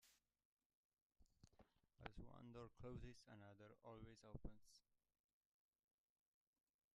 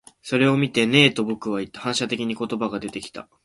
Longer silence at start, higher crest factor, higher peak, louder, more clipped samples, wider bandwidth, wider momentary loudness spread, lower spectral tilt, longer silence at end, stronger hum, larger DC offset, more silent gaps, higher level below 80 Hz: second, 0 s vs 0.25 s; first, 32 dB vs 22 dB; second, -32 dBFS vs 0 dBFS; second, -62 LUFS vs -21 LUFS; neither; about the same, 11.5 kHz vs 11.5 kHz; second, 7 LU vs 14 LU; first, -6 dB/octave vs -4.5 dB/octave; first, 2 s vs 0.2 s; neither; neither; first, 0.45-0.57 s, 0.65-0.92 s, 1.02-1.10 s vs none; second, -70 dBFS vs -60 dBFS